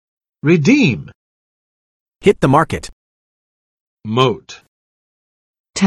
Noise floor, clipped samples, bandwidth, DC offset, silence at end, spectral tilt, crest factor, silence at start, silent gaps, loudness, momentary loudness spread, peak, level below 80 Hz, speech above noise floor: under -90 dBFS; under 0.1%; 12.5 kHz; under 0.1%; 0 s; -6 dB/octave; 18 dB; 0.45 s; 1.15-2.06 s, 2.92-3.97 s, 4.68-5.64 s; -15 LUFS; 16 LU; 0 dBFS; -46 dBFS; over 76 dB